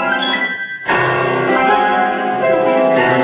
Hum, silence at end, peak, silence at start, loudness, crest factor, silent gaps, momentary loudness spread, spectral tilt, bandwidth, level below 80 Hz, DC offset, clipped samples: none; 0 s; -2 dBFS; 0 s; -14 LUFS; 12 dB; none; 4 LU; -8.5 dB/octave; 4 kHz; -54 dBFS; under 0.1%; under 0.1%